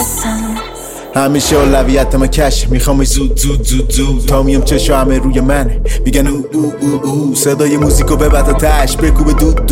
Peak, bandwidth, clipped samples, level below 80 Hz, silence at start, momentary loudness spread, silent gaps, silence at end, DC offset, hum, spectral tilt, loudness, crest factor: 0 dBFS; 16.5 kHz; under 0.1%; -14 dBFS; 0 s; 6 LU; none; 0 s; under 0.1%; none; -5 dB/octave; -12 LUFS; 10 dB